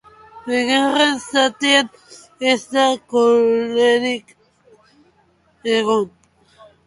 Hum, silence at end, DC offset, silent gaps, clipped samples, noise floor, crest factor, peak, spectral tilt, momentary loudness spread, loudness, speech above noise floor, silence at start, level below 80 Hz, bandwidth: none; 0.8 s; under 0.1%; none; under 0.1%; -58 dBFS; 16 dB; -2 dBFS; -2.5 dB/octave; 11 LU; -17 LUFS; 41 dB; 0.35 s; -64 dBFS; 11.5 kHz